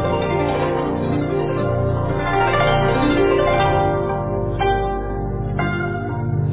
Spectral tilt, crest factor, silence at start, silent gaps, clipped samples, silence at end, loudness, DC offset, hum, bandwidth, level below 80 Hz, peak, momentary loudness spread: -11 dB/octave; 14 dB; 0 s; none; under 0.1%; 0 s; -19 LUFS; under 0.1%; none; 4 kHz; -32 dBFS; -4 dBFS; 7 LU